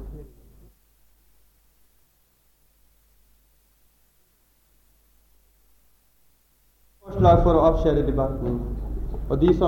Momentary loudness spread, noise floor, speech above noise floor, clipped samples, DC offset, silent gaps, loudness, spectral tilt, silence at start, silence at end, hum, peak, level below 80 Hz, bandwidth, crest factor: 18 LU; -63 dBFS; 44 dB; under 0.1%; under 0.1%; none; -22 LUFS; -9.5 dB/octave; 0 s; 0 s; none; -4 dBFS; -34 dBFS; 17 kHz; 22 dB